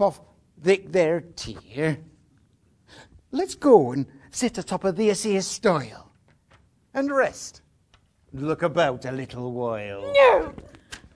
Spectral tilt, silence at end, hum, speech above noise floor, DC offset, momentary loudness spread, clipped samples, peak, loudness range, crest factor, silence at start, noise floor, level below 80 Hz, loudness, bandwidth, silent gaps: -5 dB/octave; 0.2 s; none; 39 dB; under 0.1%; 18 LU; under 0.1%; -2 dBFS; 5 LU; 22 dB; 0 s; -62 dBFS; -56 dBFS; -23 LUFS; 11 kHz; none